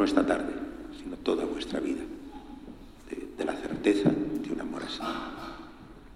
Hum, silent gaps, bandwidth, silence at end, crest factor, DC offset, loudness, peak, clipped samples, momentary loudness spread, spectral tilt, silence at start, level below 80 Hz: none; none; 12.5 kHz; 0 s; 22 dB; under 0.1%; -31 LUFS; -8 dBFS; under 0.1%; 20 LU; -6 dB/octave; 0 s; -52 dBFS